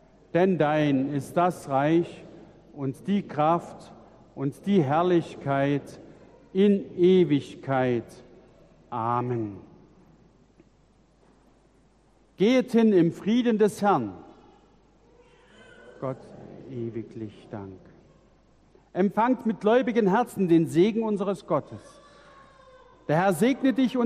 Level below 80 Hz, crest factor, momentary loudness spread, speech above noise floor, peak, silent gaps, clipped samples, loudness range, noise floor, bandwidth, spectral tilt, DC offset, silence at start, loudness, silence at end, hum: -64 dBFS; 18 dB; 19 LU; 37 dB; -10 dBFS; none; under 0.1%; 15 LU; -61 dBFS; 14 kHz; -7.5 dB/octave; under 0.1%; 0.35 s; -25 LUFS; 0 s; none